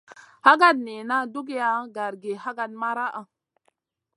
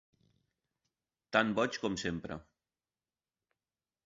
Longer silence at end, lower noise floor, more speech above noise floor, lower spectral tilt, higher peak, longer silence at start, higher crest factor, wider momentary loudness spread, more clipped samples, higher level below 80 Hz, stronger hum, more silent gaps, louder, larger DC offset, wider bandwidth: second, 0.95 s vs 1.65 s; second, -71 dBFS vs under -90 dBFS; second, 48 dB vs over 57 dB; about the same, -3.5 dB/octave vs -3 dB/octave; first, -2 dBFS vs -12 dBFS; second, 0.45 s vs 1.3 s; about the same, 24 dB vs 28 dB; about the same, 15 LU vs 15 LU; neither; second, -86 dBFS vs -64 dBFS; neither; neither; first, -23 LUFS vs -34 LUFS; neither; first, 11.5 kHz vs 7.6 kHz